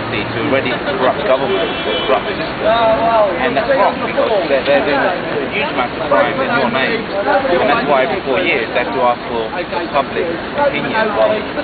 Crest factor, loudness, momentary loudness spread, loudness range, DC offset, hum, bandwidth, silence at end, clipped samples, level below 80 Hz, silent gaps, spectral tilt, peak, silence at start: 16 dB; -15 LUFS; 5 LU; 2 LU; under 0.1%; none; 4.9 kHz; 0 s; under 0.1%; -42 dBFS; none; -8.5 dB/octave; 0 dBFS; 0 s